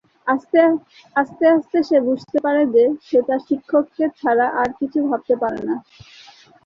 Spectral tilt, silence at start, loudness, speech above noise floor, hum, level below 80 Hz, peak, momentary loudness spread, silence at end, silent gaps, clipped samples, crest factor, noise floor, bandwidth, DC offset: -7 dB/octave; 0.25 s; -19 LUFS; 28 dB; none; -62 dBFS; -2 dBFS; 7 LU; 0.85 s; none; under 0.1%; 16 dB; -47 dBFS; 7 kHz; under 0.1%